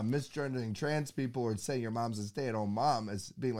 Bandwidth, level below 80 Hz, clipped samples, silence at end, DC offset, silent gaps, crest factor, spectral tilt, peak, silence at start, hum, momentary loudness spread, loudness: 16.5 kHz; -70 dBFS; under 0.1%; 0 s; 0.1%; none; 16 dB; -6 dB/octave; -18 dBFS; 0 s; none; 5 LU; -35 LUFS